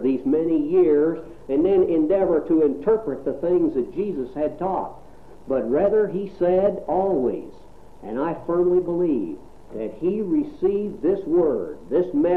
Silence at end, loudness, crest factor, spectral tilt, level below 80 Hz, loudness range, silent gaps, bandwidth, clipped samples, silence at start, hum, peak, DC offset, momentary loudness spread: 0 s; -22 LUFS; 12 dB; -10 dB/octave; -48 dBFS; 4 LU; none; 4.3 kHz; under 0.1%; 0 s; none; -8 dBFS; 0.6%; 10 LU